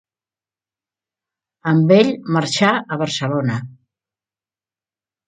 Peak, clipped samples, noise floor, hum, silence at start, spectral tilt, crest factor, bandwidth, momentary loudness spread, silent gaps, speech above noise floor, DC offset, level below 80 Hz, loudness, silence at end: 0 dBFS; under 0.1%; under -90 dBFS; none; 1.65 s; -5.5 dB/octave; 20 dB; 9.4 kHz; 10 LU; none; over 74 dB; under 0.1%; -64 dBFS; -17 LUFS; 1.55 s